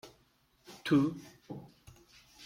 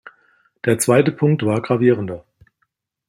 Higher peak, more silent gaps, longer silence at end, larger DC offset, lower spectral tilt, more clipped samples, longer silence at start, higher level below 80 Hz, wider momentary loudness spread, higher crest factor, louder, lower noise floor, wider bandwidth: second, -16 dBFS vs -2 dBFS; neither; second, 0 s vs 0.9 s; neither; about the same, -6.5 dB/octave vs -6 dB/octave; neither; second, 0.05 s vs 0.65 s; second, -70 dBFS vs -58 dBFS; first, 20 LU vs 11 LU; about the same, 20 dB vs 18 dB; second, -31 LUFS vs -17 LUFS; about the same, -70 dBFS vs -71 dBFS; about the same, 15.5 kHz vs 16.5 kHz